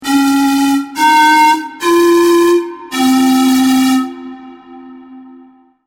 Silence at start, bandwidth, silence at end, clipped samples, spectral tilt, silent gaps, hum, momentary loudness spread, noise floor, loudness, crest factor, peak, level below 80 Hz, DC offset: 0 s; 18 kHz; 0.65 s; under 0.1%; -2.5 dB/octave; none; none; 8 LU; -43 dBFS; -11 LUFS; 10 dB; -2 dBFS; -54 dBFS; under 0.1%